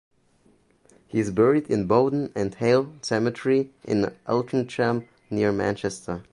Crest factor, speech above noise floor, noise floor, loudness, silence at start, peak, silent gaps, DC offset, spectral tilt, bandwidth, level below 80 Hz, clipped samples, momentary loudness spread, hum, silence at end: 20 dB; 38 dB; -61 dBFS; -24 LUFS; 1.15 s; -6 dBFS; none; under 0.1%; -6.5 dB/octave; 11.5 kHz; -56 dBFS; under 0.1%; 9 LU; none; 0.1 s